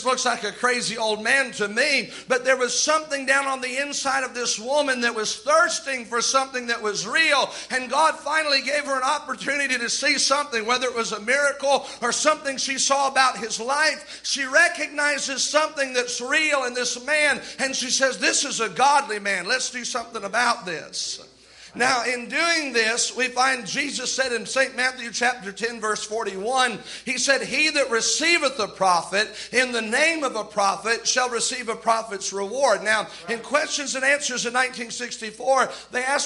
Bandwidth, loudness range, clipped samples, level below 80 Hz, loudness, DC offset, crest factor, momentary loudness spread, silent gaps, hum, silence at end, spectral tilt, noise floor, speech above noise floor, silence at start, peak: 11.5 kHz; 2 LU; under 0.1%; -66 dBFS; -22 LUFS; under 0.1%; 18 dB; 7 LU; none; none; 0 s; -0.5 dB/octave; -48 dBFS; 25 dB; 0 s; -4 dBFS